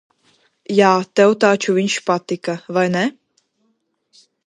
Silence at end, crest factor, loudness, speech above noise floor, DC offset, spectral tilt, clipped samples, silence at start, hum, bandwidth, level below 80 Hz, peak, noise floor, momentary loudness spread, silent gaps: 1.35 s; 18 dB; -17 LUFS; 51 dB; under 0.1%; -5 dB/octave; under 0.1%; 0.7 s; none; 11.5 kHz; -68 dBFS; 0 dBFS; -67 dBFS; 9 LU; none